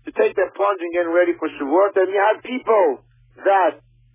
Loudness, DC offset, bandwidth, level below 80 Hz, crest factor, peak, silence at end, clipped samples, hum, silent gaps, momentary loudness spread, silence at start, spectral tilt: -19 LUFS; under 0.1%; 3.8 kHz; -62 dBFS; 14 dB; -6 dBFS; 0.4 s; under 0.1%; none; none; 6 LU; 0.05 s; -8 dB/octave